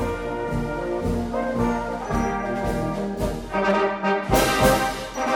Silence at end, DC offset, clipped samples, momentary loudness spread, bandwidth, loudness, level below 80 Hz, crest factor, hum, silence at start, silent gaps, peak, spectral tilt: 0 s; under 0.1%; under 0.1%; 8 LU; 17 kHz; -23 LUFS; -36 dBFS; 18 dB; none; 0 s; none; -4 dBFS; -5 dB/octave